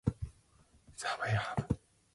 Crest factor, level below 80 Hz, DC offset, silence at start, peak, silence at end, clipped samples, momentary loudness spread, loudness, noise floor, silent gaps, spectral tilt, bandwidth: 22 dB; -52 dBFS; under 0.1%; 0.05 s; -16 dBFS; 0.4 s; under 0.1%; 14 LU; -37 LUFS; -66 dBFS; none; -5.5 dB/octave; 11.5 kHz